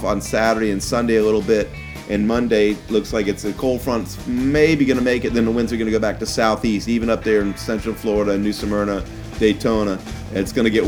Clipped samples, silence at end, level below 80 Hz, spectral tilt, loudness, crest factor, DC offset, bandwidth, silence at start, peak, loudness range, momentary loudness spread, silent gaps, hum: under 0.1%; 0 s; -36 dBFS; -5.5 dB/octave; -19 LUFS; 16 dB; under 0.1%; 18.5 kHz; 0 s; -2 dBFS; 2 LU; 7 LU; none; none